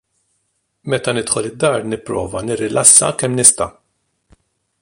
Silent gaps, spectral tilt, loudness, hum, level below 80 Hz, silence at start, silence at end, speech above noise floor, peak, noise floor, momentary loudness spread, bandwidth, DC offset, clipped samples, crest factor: none; -2.5 dB/octave; -14 LUFS; none; -48 dBFS; 0.85 s; 1.1 s; 53 dB; 0 dBFS; -68 dBFS; 15 LU; 16 kHz; under 0.1%; 0.2%; 18 dB